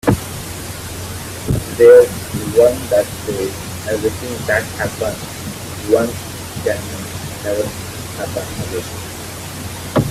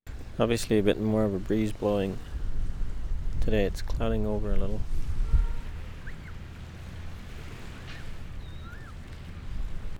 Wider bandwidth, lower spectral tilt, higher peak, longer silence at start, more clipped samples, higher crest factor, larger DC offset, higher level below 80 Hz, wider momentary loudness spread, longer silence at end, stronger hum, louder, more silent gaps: about the same, 16 kHz vs 15.5 kHz; second, -5 dB/octave vs -6.5 dB/octave; first, 0 dBFS vs -10 dBFS; about the same, 0.05 s vs 0.05 s; neither; about the same, 18 dB vs 18 dB; neither; second, -40 dBFS vs -32 dBFS; second, 14 LU vs 17 LU; about the same, 0 s vs 0 s; neither; first, -18 LUFS vs -30 LUFS; neither